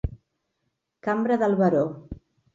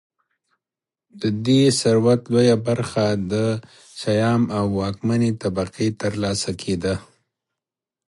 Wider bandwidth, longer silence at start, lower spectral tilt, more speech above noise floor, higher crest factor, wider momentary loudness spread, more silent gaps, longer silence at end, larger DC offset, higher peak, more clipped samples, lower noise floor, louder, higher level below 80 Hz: second, 7.6 kHz vs 11.5 kHz; second, 0.05 s vs 1.15 s; first, -9 dB/octave vs -6 dB/octave; second, 55 dB vs 69 dB; about the same, 18 dB vs 16 dB; first, 21 LU vs 9 LU; neither; second, 0.4 s vs 1.05 s; neither; second, -8 dBFS vs -4 dBFS; neither; second, -78 dBFS vs -89 dBFS; second, -24 LUFS vs -21 LUFS; about the same, -44 dBFS vs -48 dBFS